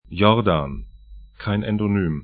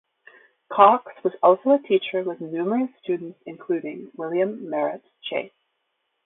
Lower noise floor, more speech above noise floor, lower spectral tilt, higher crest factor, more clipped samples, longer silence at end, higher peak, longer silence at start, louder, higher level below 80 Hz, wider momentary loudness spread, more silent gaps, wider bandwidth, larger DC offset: second, -43 dBFS vs -75 dBFS; second, 23 dB vs 53 dB; first, -12 dB/octave vs -10 dB/octave; about the same, 20 dB vs 22 dB; neither; second, 0 s vs 0.8 s; about the same, 0 dBFS vs -2 dBFS; second, 0.1 s vs 0.7 s; about the same, -21 LUFS vs -23 LUFS; first, -40 dBFS vs -76 dBFS; about the same, 15 LU vs 17 LU; neither; first, 4.8 kHz vs 4 kHz; neither